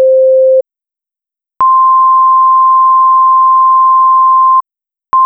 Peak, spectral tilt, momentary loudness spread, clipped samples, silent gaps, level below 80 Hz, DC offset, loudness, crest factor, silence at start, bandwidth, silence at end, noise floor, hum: -4 dBFS; -6.5 dB/octave; 4 LU; under 0.1%; none; -64 dBFS; under 0.1%; -7 LUFS; 4 dB; 0 s; 1.9 kHz; 0 s; -87 dBFS; none